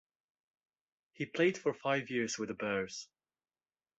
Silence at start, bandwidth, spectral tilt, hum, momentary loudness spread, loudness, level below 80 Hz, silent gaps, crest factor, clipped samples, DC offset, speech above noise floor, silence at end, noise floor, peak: 1.2 s; 8 kHz; -4 dB/octave; none; 12 LU; -35 LUFS; -76 dBFS; none; 20 dB; under 0.1%; under 0.1%; over 55 dB; 0.95 s; under -90 dBFS; -18 dBFS